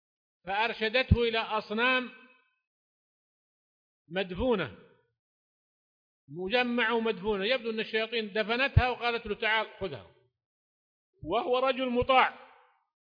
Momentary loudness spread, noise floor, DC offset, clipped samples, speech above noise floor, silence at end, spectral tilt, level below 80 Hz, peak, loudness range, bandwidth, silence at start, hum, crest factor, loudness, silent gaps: 13 LU; -60 dBFS; under 0.1%; under 0.1%; 31 dB; 0.75 s; -7.5 dB/octave; -46 dBFS; -10 dBFS; 8 LU; 5.2 kHz; 0.45 s; none; 22 dB; -29 LUFS; 2.67-4.05 s, 5.19-6.28 s, 10.46-11.13 s